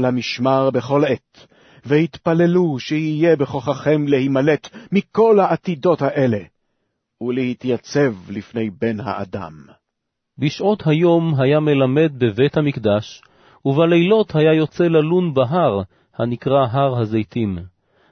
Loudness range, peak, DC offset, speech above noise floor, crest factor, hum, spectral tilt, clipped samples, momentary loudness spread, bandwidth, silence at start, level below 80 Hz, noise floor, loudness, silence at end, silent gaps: 6 LU; -2 dBFS; under 0.1%; 60 dB; 16 dB; none; -7.5 dB/octave; under 0.1%; 10 LU; 6.6 kHz; 0 s; -56 dBFS; -77 dBFS; -18 LUFS; 0.45 s; none